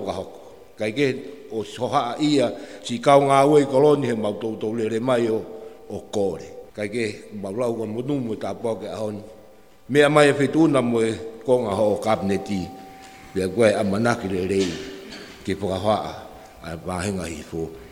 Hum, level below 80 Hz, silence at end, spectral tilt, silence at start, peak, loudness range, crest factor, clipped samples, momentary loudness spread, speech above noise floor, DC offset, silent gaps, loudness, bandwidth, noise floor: none; -54 dBFS; 0 s; -6 dB/octave; 0 s; -2 dBFS; 8 LU; 22 dB; under 0.1%; 19 LU; 29 dB; under 0.1%; none; -22 LUFS; 16 kHz; -50 dBFS